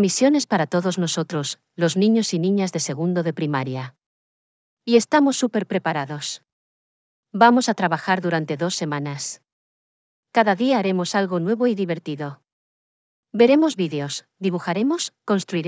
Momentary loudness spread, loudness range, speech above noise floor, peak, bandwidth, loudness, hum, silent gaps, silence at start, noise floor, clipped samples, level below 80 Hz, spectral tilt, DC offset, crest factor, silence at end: 13 LU; 2 LU; over 69 dB; -2 dBFS; 8 kHz; -21 LUFS; none; 4.06-4.77 s, 6.52-7.23 s, 9.52-10.23 s, 12.52-13.23 s; 0 s; under -90 dBFS; under 0.1%; -84 dBFS; -5 dB/octave; under 0.1%; 20 dB; 0 s